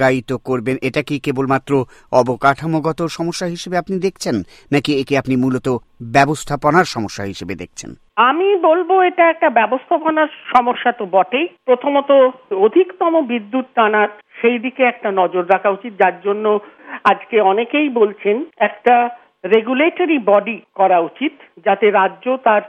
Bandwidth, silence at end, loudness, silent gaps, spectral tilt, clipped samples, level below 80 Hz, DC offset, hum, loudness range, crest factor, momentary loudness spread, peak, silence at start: 14 kHz; 0 s; -16 LUFS; none; -5.5 dB/octave; under 0.1%; -52 dBFS; under 0.1%; none; 3 LU; 16 dB; 9 LU; 0 dBFS; 0 s